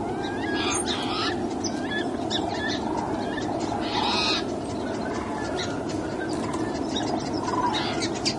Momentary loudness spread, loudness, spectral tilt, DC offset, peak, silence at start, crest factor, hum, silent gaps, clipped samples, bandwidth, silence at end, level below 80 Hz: 5 LU; -27 LUFS; -4 dB/octave; under 0.1%; -10 dBFS; 0 s; 16 dB; none; none; under 0.1%; 11.5 kHz; 0 s; -50 dBFS